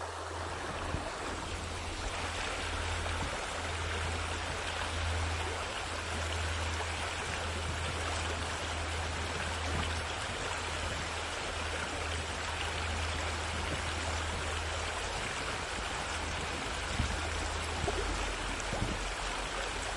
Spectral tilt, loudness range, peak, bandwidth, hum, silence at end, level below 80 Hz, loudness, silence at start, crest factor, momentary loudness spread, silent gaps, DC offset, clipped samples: -3.5 dB/octave; 1 LU; -18 dBFS; 11.5 kHz; none; 0 s; -44 dBFS; -35 LUFS; 0 s; 18 dB; 2 LU; none; under 0.1%; under 0.1%